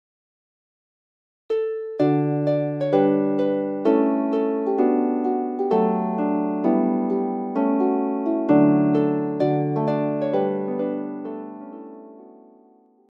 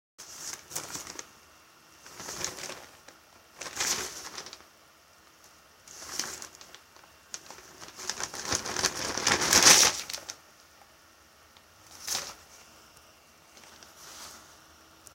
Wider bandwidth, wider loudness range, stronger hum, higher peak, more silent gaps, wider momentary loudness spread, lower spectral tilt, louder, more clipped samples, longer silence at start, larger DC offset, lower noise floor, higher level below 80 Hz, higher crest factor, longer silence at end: second, 5.6 kHz vs 17 kHz; second, 4 LU vs 18 LU; neither; second, -6 dBFS vs -2 dBFS; neither; second, 9 LU vs 28 LU; first, -10.5 dB/octave vs 0 dB/octave; first, -22 LUFS vs -26 LUFS; neither; first, 1.5 s vs 0.2 s; neither; about the same, -55 dBFS vs -58 dBFS; second, -74 dBFS vs -62 dBFS; second, 16 dB vs 32 dB; first, 0.85 s vs 0.65 s